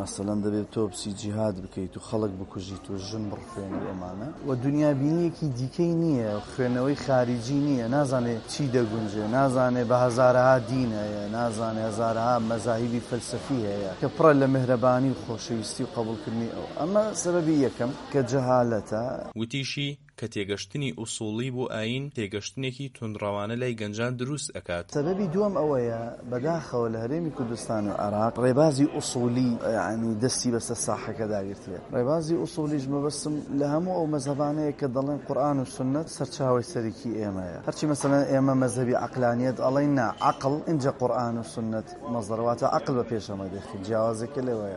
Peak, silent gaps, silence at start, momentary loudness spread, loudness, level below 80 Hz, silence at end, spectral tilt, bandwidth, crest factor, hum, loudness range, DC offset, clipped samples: -6 dBFS; none; 0 s; 10 LU; -27 LUFS; -56 dBFS; 0 s; -6 dB/octave; 11.5 kHz; 20 dB; none; 7 LU; under 0.1%; under 0.1%